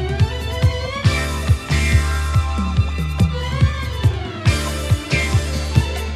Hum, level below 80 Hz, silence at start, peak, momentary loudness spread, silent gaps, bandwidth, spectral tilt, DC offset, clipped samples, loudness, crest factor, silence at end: none; -24 dBFS; 0 s; 0 dBFS; 3 LU; none; 14.5 kHz; -5.5 dB/octave; under 0.1%; under 0.1%; -19 LUFS; 18 dB; 0 s